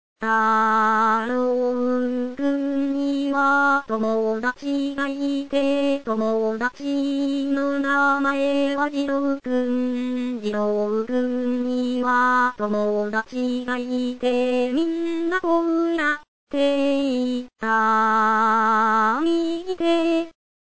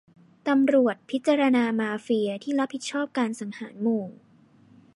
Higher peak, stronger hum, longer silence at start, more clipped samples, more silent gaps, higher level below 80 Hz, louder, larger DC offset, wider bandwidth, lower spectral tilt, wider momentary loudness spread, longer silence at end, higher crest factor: about the same, -10 dBFS vs -10 dBFS; neither; second, 0.15 s vs 0.45 s; neither; first, 16.28-16.47 s vs none; first, -62 dBFS vs -80 dBFS; first, -22 LUFS vs -25 LUFS; first, 0.9% vs under 0.1%; second, 8 kHz vs 11.5 kHz; about the same, -5 dB/octave vs -5 dB/octave; about the same, 7 LU vs 9 LU; second, 0.35 s vs 0.85 s; about the same, 12 dB vs 16 dB